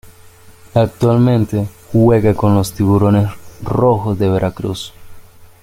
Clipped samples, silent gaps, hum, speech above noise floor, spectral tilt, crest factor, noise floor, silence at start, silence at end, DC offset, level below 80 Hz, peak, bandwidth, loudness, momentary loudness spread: under 0.1%; none; none; 28 dB; -8 dB/octave; 14 dB; -41 dBFS; 0.05 s; 0.2 s; under 0.1%; -38 dBFS; 0 dBFS; 16 kHz; -15 LUFS; 11 LU